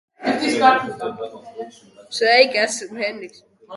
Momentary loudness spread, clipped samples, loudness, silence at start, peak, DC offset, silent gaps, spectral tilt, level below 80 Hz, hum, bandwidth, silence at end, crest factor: 22 LU; under 0.1%; -18 LUFS; 0.2 s; 0 dBFS; under 0.1%; none; -2.5 dB/octave; -68 dBFS; none; 11.5 kHz; 0 s; 20 dB